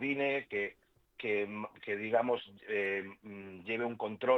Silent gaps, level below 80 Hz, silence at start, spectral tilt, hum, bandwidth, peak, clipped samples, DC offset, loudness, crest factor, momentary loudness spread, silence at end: none; -78 dBFS; 0 s; -7 dB/octave; none; 6.2 kHz; -16 dBFS; under 0.1%; under 0.1%; -36 LUFS; 20 dB; 12 LU; 0 s